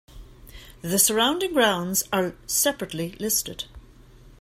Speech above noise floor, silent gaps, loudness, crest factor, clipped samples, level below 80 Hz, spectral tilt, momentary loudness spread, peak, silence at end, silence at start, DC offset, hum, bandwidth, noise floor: 25 dB; none; -23 LUFS; 20 dB; under 0.1%; -50 dBFS; -2.5 dB/octave; 14 LU; -6 dBFS; 0.1 s; 0.15 s; under 0.1%; none; 16 kHz; -49 dBFS